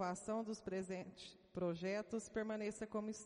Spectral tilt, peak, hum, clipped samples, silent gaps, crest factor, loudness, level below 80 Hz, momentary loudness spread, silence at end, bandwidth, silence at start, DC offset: -5.5 dB/octave; -30 dBFS; none; under 0.1%; none; 14 dB; -45 LUFS; -74 dBFS; 7 LU; 0 s; 10.5 kHz; 0 s; under 0.1%